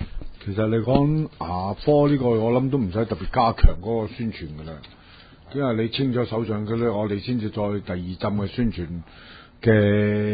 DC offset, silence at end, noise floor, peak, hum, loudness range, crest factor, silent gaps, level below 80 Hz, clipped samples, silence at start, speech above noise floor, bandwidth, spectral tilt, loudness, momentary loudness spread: under 0.1%; 0 s; -48 dBFS; 0 dBFS; none; 5 LU; 22 dB; none; -32 dBFS; under 0.1%; 0 s; 26 dB; 5 kHz; -12 dB/octave; -23 LUFS; 15 LU